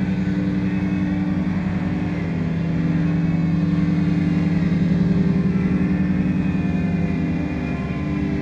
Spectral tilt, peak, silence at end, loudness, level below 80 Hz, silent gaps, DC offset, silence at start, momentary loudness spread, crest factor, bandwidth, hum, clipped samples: -9 dB/octave; -6 dBFS; 0 s; -21 LUFS; -36 dBFS; none; under 0.1%; 0 s; 5 LU; 12 dB; 7 kHz; none; under 0.1%